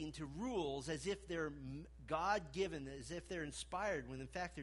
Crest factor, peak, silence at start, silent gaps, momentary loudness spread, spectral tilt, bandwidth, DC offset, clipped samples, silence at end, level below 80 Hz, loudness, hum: 18 dB; -26 dBFS; 0 s; none; 9 LU; -4.5 dB/octave; 11.5 kHz; under 0.1%; under 0.1%; 0 s; -60 dBFS; -44 LUFS; none